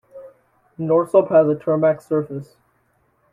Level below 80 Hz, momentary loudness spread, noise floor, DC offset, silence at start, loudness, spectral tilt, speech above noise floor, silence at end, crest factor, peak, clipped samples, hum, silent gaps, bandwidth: -64 dBFS; 15 LU; -63 dBFS; under 0.1%; 0.15 s; -18 LUFS; -9.5 dB/octave; 46 dB; 0.9 s; 18 dB; -4 dBFS; under 0.1%; none; none; 11 kHz